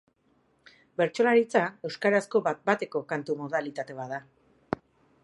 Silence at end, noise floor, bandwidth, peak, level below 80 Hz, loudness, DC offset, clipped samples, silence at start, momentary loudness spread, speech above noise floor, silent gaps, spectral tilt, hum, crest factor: 0.5 s; -68 dBFS; 11.5 kHz; -8 dBFS; -70 dBFS; -28 LUFS; under 0.1%; under 0.1%; 1 s; 14 LU; 41 dB; none; -5.5 dB/octave; none; 22 dB